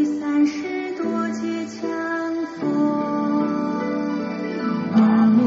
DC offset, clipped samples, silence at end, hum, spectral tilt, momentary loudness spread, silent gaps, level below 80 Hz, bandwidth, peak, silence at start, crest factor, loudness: under 0.1%; under 0.1%; 0 s; none; -6 dB/octave; 9 LU; none; -66 dBFS; 7.6 kHz; -6 dBFS; 0 s; 14 dB; -22 LUFS